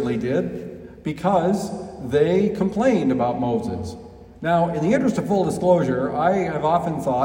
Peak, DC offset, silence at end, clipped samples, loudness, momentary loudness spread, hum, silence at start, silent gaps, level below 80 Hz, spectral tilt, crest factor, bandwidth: -6 dBFS; under 0.1%; 0 s; under 0.1%; -21 LUFS; 12 LU; none; 0 s; none; -50 dBFS; -7.5 dB/octave; 16 dB; 16 kHz